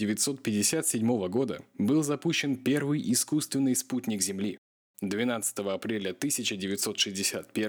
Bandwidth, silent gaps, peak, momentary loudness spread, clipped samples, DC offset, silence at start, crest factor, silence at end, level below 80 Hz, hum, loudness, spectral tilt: over 20 kHz; 4.58-4.94 s; -12 dBFS; 6 LU; under 0.1%; under 0.1%; 0 s; 16 dB; 0 s; -76 dBFS; none; -29 LUFS; -3.5 dB/octave